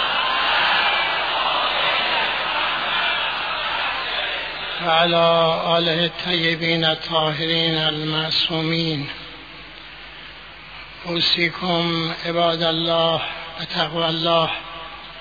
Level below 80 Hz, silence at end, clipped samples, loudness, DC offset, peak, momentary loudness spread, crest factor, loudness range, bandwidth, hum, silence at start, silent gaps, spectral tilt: -50 dBFS; 0 s; under 0.1%; -19 LUFS; 0.2%; -4 dBFS; 18 LU; 16 dB; 5 LU; 5 kHz; none; 0 s; none; -5.5 dB/octave